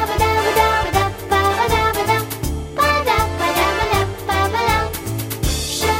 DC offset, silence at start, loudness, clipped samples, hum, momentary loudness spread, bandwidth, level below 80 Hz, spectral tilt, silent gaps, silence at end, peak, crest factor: under 0.1%; 0 s; -18 LUFS; under 0.1%; none; 7 LU; 16.5 kHz; -30 dBFS; -4 dB/octave; none; 0 s; -2 dBFS; 16 dB